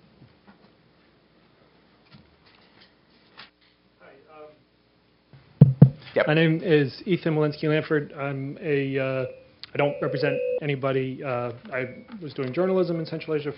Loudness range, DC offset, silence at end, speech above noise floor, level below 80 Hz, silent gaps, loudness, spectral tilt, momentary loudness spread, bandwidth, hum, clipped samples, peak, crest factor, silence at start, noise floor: 6 LU; under 0.1%; 0 s; 37 dB; -58 dBFS; none; -24 LUFS; -10.5 dB/octave; 13 LU; 5.6 kHz; none; under 0.1%; 0 dBFS; 24 dB; 3.4 s; -62 dBFS